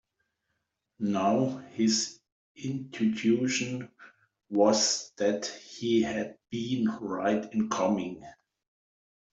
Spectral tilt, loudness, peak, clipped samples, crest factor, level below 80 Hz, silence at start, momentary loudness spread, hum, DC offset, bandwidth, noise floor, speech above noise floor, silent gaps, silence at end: -4 dB/octave; -29 LUFS; -10 dBFS; under 0.1%; 20 dB; -70 dBFS; 1 s; 11 LU; none; under 0.1%; 8.2 kHz; -81 dBFS; 53 dB; 2.32-2.55 s; 1 s